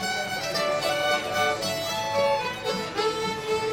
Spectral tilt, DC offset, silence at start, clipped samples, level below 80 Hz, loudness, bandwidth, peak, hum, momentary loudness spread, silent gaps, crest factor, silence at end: -2.5 dB/octave; under 0.1%; 0 s; under 0.1%; -56 dBFS; -26 LUFS; 18 kHz; -12 dBFS; none; 4 LU; none; 14 dB; 0 s